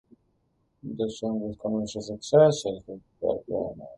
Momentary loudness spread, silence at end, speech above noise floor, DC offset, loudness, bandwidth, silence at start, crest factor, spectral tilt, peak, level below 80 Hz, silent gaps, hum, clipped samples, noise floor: 19 LU; 0 s; 45 dB; under 0.1%; -27 LUFS; 11.5 kHz; 0.85 s; 20 dB; -6 dB/octave; -6 dBFS; -60 dBFS; none; none; under 0.1%; -71 dBFS